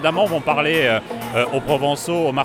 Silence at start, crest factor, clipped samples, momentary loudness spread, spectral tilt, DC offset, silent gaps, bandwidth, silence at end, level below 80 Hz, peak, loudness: 0 s; 16 dB; under 0.1%; 5 LU; -4.5 dB/octave; under 0.1%; none; 17.5 kHz; 0 s; -52 dBFS; -4 dBFS; -19 LUFS